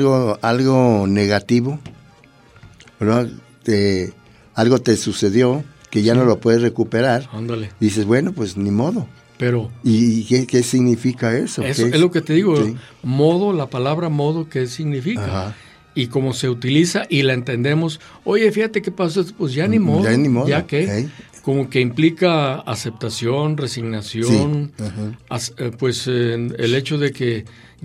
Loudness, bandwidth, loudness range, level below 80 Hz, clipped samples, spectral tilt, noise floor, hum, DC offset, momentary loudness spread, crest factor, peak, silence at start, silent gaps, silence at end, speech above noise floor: -18 LUFS; 14.5 kHz; 4 LU; -54 dBFS; under 0.1%; -6 dB/octave; -48 dBFS; none; under 0.1%; 10 LU; 16 dB; -2 dBFS; 0 s; none; 0.35 s; 31 dB